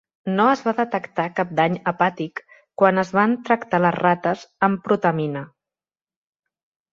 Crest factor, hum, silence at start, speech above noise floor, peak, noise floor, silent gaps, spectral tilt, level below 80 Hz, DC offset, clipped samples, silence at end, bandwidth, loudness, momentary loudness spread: 20 dB; none; 0.25 s; over 70 dB; -2 dBFS; under -90 dBFS; none; -7 dB/octave; -66 dBFS; under 0.1%; under 0.1%; 1.45 s; 7.4 kHz; -21 LUFS; 9 LU